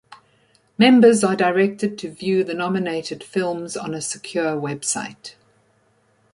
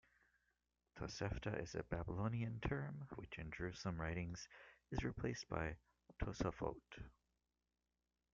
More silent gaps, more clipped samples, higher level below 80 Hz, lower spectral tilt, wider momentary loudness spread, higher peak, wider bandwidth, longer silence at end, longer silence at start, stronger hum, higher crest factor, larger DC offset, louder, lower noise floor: neither; neither; second, -66 dBFS vs -58 dBFS; second, -4.5 dB/octave vs -6 dB/octave; about the same, 14 LU vs 14 LU; first, -2 dBFS vs -26 dBFS; first, 11.5 kHz vs 7.4 kHz; second, 1.05 s vs 1.25 s; second, 0.1 s vs 0.95 s; second, none vs 60 Hz at -70 dBFS; about the same, 18 dB vs 20 dB; neither; first, -20 LUFS vs -47 LUFS; second, -61 dBFS vs under -90 dBFS